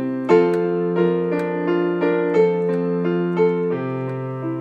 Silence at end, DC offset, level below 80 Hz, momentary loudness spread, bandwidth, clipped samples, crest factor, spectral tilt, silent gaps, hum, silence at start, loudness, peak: 0 s; under 0.1%; -70 dBFS; 8 LU; 7.6 kHz; under 0.1%; 16 dB; -9 dB/octave; none; none; 0 s; -20 LUFS; -4 dBFS